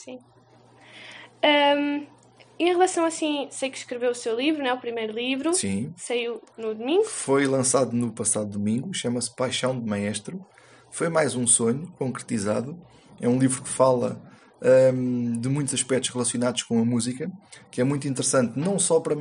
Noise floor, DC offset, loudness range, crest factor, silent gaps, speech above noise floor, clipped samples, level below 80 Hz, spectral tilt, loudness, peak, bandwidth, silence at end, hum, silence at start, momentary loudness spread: -52 dBFS; under 0.1%; 3 LU; 20 dB; none; 28 dB; under 0.1%; -68 dBFS; -4 dB/octave; -24 LUFS; -6 dBFS; 11.5 kHz; 0 s; none; 0 s; 13 LU